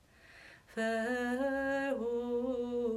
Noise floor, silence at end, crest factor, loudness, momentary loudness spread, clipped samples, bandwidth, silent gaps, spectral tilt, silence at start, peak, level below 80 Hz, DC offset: -58 dBFS; 0 s; 12 dB; -35 LUFS; 17 LU; under 0.1%; 14.5 kHz; none; -5 dB/octave; 0.3 s; -24 dBFS; -64 dBFS; under 0.1%